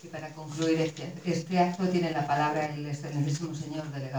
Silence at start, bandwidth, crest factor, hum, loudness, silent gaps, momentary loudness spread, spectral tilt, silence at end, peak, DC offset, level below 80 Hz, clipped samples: 0.05 s; over 20 kHz; 18 dB; none; -30 LUFS; none; 9 LU; -6 dB/octave; 0 s; -12 dBFS; under 0.1%; -70 dBFS; under 0.1%